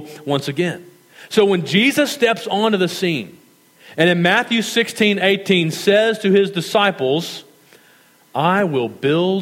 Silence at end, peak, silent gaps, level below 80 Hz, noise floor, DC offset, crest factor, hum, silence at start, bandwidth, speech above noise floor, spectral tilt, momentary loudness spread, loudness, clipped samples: 0 s; 0 dBFS; none; -68 dBFS; -51 dBFS; under 0.1%; 16 dB; none; 0 s; 16.5 kHz; 34 dB; -5 dB/octave; 8 LU; -17 LUFS; under 0.1%